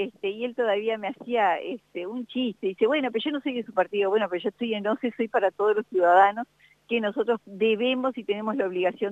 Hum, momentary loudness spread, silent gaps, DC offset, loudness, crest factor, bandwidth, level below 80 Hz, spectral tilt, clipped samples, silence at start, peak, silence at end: none; 8 LU; none; under 0.1%; -26 LUFS; 18 dB; 7.8 kHz; -76 dBFS; -6.5 dB/octave; under 0.1%; 0 s; -6 dBFS; 0 s